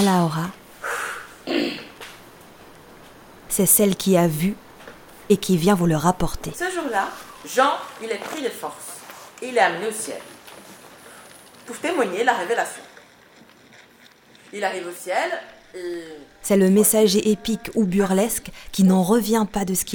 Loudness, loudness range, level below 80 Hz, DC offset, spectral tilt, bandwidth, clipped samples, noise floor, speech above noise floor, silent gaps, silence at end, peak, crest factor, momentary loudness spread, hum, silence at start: -21 LUFS; 9 LU; -48 dBFS; under 0.1%; -4.5 dB/octave; over 20 kHz; under 0.1%; -51 dBFS; 31 dB; none; 0 s; -2 dBFS; 20 dB; 22 LU; none; 0 s